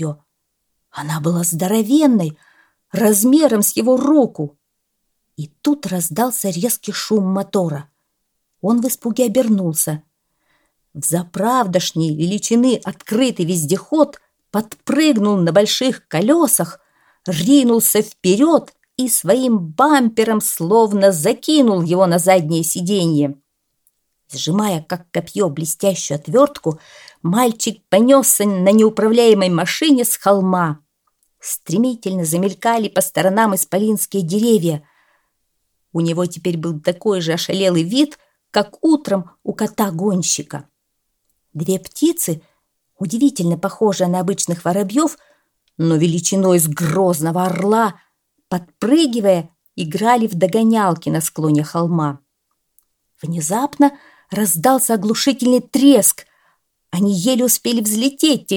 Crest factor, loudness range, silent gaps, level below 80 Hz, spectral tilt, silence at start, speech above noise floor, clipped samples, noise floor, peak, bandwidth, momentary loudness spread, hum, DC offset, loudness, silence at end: 16 dB; 6 LU; none; -64 dBFS; -4.5 dB/octave; 0 s; 56 dB; under 0.1%; -72 dBFS; 0 dBFS; 19.5 kHz; 11 LU; none; under 0.1%; -16 LUFS; 0 s